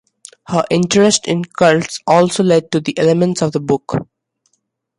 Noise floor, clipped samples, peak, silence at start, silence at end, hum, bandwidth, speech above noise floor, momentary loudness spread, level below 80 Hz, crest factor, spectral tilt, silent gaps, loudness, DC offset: -68 dBFS; under 0.1%; 0 dBFS; 0.5 s; 0.95 s; none; 11.5 kHz; 54 dB; 8 LU; -52 dBFS; 14 dB; -5 dB/octave; none; -15 LUFS; under 0.1%